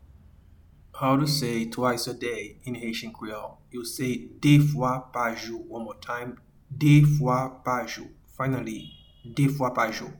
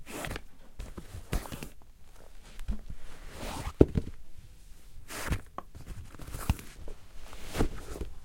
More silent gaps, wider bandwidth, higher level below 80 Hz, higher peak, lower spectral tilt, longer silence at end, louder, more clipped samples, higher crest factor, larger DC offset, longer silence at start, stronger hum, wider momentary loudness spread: neither; first, 19 kHz vs 16.5 kHz; second, -54 dBFS vs -40 dBFS; second, -8 dBFS vs -4 dBFS; about the same, -6 dB/octave vs -6 dB/octave; about the same, 0 s vs 0 s; first, -26 LUFS vs -35 LUFS; neither; second, 20 dB vs 32 dB; second, under 0.1% vs 0.1%; first, 0.95 s vs 0 s; neither; second, 18 LU vs 22 LU